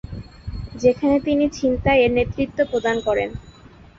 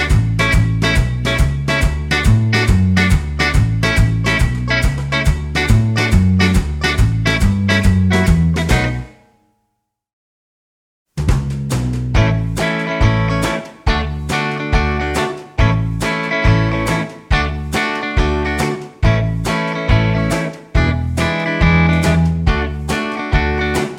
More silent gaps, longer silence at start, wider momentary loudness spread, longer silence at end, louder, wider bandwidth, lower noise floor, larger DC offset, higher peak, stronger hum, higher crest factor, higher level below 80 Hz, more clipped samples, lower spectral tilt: second, none vs 10.13-11.06 s; about the same, 0.05 s vs 0 s; first, 18 LU vs 6 LU; first, 0.5 s vs 0 s; second, -20 LUFS vs -16 LUFS; second, 7.6 kHz vs 16 kHz; second, -45 dBFS vs -71 dBFS; neither; second, -4 dBFS vs 0 dBFS; neither; about the same, 16 dB vs 16 dB; second, -38 dBFS vs -22 dBFS; neither; about the same, -6.5 dB/octave vs -6 dB/octave